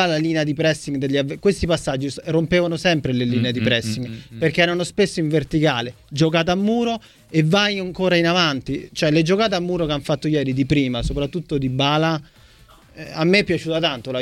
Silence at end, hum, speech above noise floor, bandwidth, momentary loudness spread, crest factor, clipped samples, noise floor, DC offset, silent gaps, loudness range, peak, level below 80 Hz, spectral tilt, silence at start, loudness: 0 s; none; 29 dB; 13 kHz; 8 LU; 16 dB; under 0.1%; -49 dBFS; under 0.1%; none; 2 LU; -4 dBFS; -42 dBFS; -5.5 dB/octave; 0 s; -20 LUFS